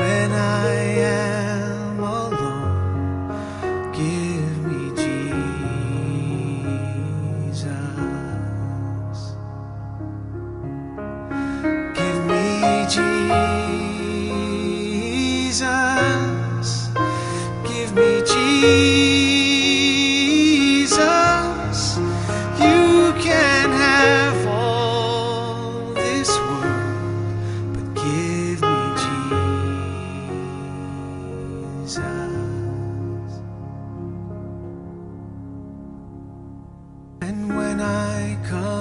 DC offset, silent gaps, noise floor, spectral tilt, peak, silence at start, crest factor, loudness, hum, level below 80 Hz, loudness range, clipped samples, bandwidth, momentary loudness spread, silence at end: under 0.1%; none; -41 dBFS; -4.5 dB/octave; -2 dBFS; 0 s; 18 dB; -20 LUFS; none; -42 dBFS; 13 LU; under 0.1%; 11 kHz; 17 LU; 0 s